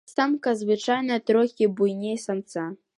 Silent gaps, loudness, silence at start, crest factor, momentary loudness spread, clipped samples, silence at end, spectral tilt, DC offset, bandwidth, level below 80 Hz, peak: none; -24 LUFS; 0.1 s; 16 dB; 8 LU; under 0.1%; 0.25 s; -5.5 dB/octave; under 0.1%; 11.5 kHz; -76 dBFS; -8 dBFS